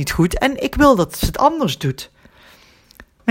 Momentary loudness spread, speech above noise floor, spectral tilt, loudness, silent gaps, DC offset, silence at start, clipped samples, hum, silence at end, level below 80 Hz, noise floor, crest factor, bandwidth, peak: 12 LU; 32 dB; -5.5 dB/octave; -17 LUFS; none; under 0.1%; 0 s; under 0.1%; none; 0 s; -32 dBFS; -49 dBFS; 18 dB; 17 kHz; 0 dBFS